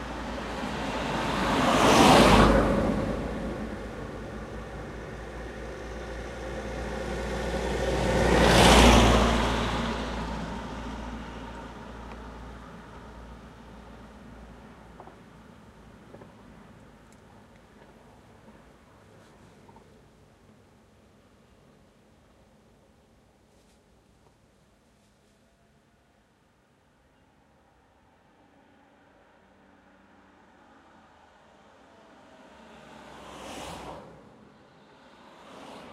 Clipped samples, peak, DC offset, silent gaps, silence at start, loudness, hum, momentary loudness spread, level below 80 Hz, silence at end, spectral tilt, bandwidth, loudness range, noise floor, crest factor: under 0.1%; -4 dBFS; under 0.1%; none; 0 s; -25 LUFS; none; 30 LU; -38 dBFS; 0 s; -4.5 dB/octave; 15 kHz; 26 LU; -64 dBFS; 26 dB